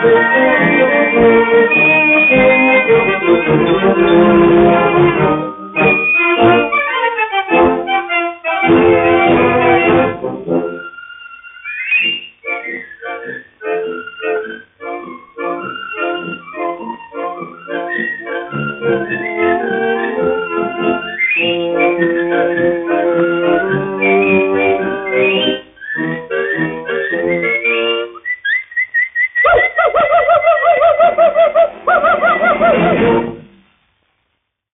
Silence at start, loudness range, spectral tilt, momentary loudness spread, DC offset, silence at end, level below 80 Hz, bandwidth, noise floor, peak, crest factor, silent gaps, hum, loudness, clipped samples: 0 s; 12 LU; -3.5 dB/octave; 15 LU; under 0.1%; 1.3 s; -44 dBFS; 3.9 kHz; -69 dBFS; 0 dBFS; 12 dB; none; none; -12 LUFS; under 0.1%